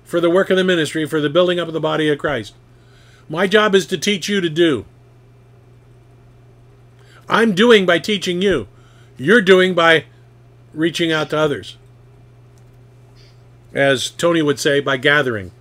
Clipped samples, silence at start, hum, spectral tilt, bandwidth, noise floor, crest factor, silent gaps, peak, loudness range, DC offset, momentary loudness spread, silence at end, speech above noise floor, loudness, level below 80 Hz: under 0.1%; 0.1 s; none; -4.5 dB/octave; 16 kHz; -46 dBFS; 18 dB; none; 0 dBFS; 8 LU; under 0.1%; 11 LU; 0.1 s; 31 dB; -16 LUFS; -52 dBFS